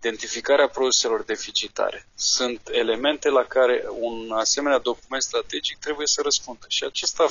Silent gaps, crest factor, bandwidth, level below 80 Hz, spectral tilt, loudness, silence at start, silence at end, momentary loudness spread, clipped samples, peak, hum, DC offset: none; 16 dB; 7.6 kHz; -56 dBFS; 0 dB/octave; -23 LUFS; 0 s; 0 s; 8 LU; under 0.1%; -6 dBFS; none; 0.2%